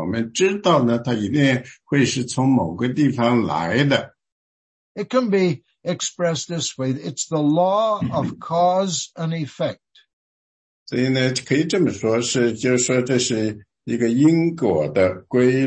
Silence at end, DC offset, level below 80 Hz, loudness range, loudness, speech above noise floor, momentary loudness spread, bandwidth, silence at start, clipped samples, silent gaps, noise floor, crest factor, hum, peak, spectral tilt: 0 s; under 0.1%; -60 dBFS; 4 LU; -20 LUFS; over 71 dB; 8 LU; 8.8 kHz; 0 s; under 0.1%; 4.32-4.95 s, 10.13-10.86 s; under -90 dBFS; 16 dB; none; -4 dBFS; -5 dB/octave